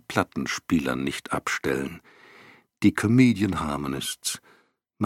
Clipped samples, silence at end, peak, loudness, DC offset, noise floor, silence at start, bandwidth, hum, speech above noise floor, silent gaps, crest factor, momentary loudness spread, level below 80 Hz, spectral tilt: under 0.1%; 0 s; -4 dBFS; -25 LUFS; under 0.1%; -62 dBFS; 0.1 s; 16 kHz; none; 38 dB; none; 22 dB; 11 LU; -52 dBFS; -5 dB/octave